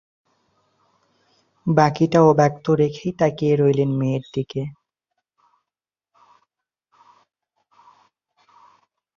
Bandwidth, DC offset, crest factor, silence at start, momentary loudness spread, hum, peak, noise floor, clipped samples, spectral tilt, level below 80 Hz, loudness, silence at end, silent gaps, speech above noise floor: 7.2 kHz; under 0.1%; 20 dB; 1.65 s; 13 LU; none; -2 dBFS; -89 dBFS; under 0.1%; -7.5 dB/octave; -60 dBFS; -19 LUFS; 4.45 s; none; 70 dB